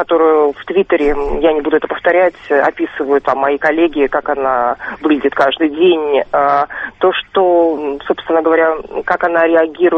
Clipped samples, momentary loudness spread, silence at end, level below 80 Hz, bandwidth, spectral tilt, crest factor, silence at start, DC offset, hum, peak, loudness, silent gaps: under 0.1%; 5 LU; 0 s; -38 dBFS; 6.2 kHz; -6.5 dB/octave; 14 dB; 0 s; under 0.1%; none; 0 dBFS; -14 LUFS; none